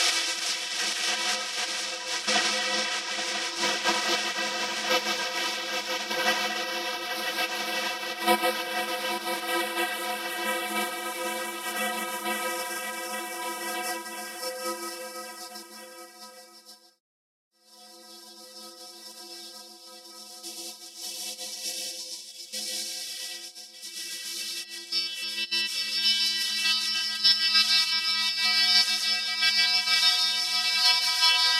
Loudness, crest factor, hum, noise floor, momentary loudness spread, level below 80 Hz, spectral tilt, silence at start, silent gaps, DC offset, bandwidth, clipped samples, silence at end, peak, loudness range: -25 LUFS; 22 dB; none; -52 dBFS; 20 LU; -80 dBFS; 0.5 dB/octave; 0 s; 17.00-17.51 s; under 0.1%; 16 kHz; under 0.1%; 0 s; -8 dBFS; 20 LU